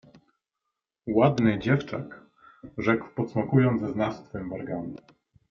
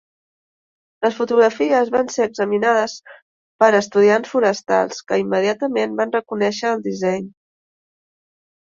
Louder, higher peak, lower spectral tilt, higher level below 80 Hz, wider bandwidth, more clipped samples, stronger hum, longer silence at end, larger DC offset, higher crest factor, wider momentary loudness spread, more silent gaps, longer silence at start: second, -26 LUFS vs -18 LUFS; second, -6 dBFS vs -2 dBFS; first, -8.5 dB/octave vs -4.5 dB/octave; first, -58 dBFS vs -66 dBFS; second, 6.8 kHz vs 7.6 kHz; neither; neither; second, 0.55 s vs 1.45 s; neither; about the same, 20 dB vs 18 dB; first, 17 LU vs 7 LU; second, none vs 3.22-3.59 s; about the same, 1.05 s vs 1 s